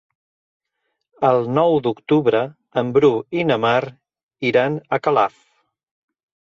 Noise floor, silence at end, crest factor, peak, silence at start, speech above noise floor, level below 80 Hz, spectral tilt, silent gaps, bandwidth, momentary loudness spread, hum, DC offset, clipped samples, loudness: -75 dBFS; 1.2 s; 16 dB; -4 dBFS; 1.2 s; 57 dB; -62 dBFS; -7.5 dB/octave; 4.23-4.29 s; 7.2 kHz; 7 LU; none; under 0.1%; under 0.1%; -19 LUFS